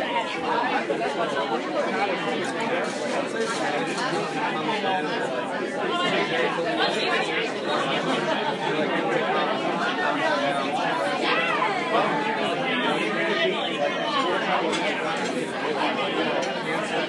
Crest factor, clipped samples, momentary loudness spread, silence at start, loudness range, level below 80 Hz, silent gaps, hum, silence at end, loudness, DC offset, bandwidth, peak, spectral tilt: 16 dB; under 0.1%; 4 LU; 0 s; 2 LU; -76 dBFS; none; none; 0 s; -24 LUFS; under 0.1%; 11.5 kHz; -10 dBFS; -4 dB/octave